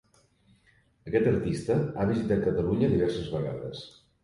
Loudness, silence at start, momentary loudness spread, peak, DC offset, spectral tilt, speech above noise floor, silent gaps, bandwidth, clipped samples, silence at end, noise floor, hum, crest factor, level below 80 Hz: -28 LUFS; 1.05 s; 14 LU; -12 dBFS; under 0.1%; -8 dB/octave; 37 dB; none; 11.5 kHz; under 0.1%; 0.35 s; -64 dBFS; none; 16 dB; -50 dBFS